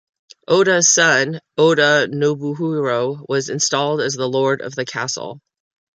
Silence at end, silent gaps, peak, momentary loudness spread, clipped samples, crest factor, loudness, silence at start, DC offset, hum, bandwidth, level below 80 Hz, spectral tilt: 0.55 s; none; -2 dBFS; 11 LU; under 0.1%; 16 dB; -17 LUFS; 0.5 s; under 0.1%; none; 10 kHz; -66 dBFS; -3 dB/octave